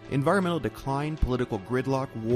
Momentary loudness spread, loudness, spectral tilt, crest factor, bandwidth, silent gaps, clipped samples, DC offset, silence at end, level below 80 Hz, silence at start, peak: 6 LU; -28 LUFS; -7 dB/octave; 16 dB; 15 kHz; none; under 0.1%; under 0.1%; 0 s; -40 dBFS; 0 s; -12 dBFS